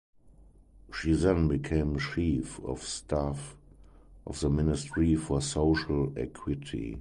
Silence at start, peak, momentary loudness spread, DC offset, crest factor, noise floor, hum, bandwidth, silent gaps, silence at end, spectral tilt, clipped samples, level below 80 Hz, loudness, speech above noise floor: 0.25 s; -12 dBFS; 10 LU; under 0.1%; 18 dB; -56 dBFS; none; 11 kHz; none; 0 s; -6 dB/octave; under 0.1%; -40 dBFS; -30 LUFS; 27 dB